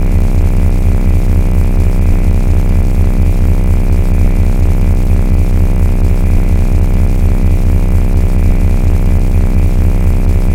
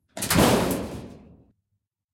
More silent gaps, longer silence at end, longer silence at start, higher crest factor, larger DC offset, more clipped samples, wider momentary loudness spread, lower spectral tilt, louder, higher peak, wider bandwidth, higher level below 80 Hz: neither; second, 0 s vs 0.95 s; second, 0 s vs 0.15 s; second, 8 dB vs 20 dB; first, 2% vs under 0.1%; neither; second, 1 LU vs 18 LU; first, -8 dB/octave vs -4.5 dB/octave; first, -13 LUFS vs -22 LUFS; first, 0 dBFS vs -6 dBFS; second, 9.8 kHz vs 16.5 kHz; first, -10 dBFS vs -44 dBFS